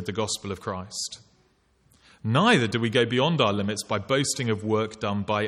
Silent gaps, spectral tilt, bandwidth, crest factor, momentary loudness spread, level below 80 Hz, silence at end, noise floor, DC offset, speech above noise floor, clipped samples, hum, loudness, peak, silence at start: none; -4.5 dB/octave; 15 kHz; 20 dB; 12 LU; -62 dBFS; 0 s; -64 dBFS; under 0.1%; 39 dB; under 0.1%; none; -25 LUFS; -6 dBFS; 0 s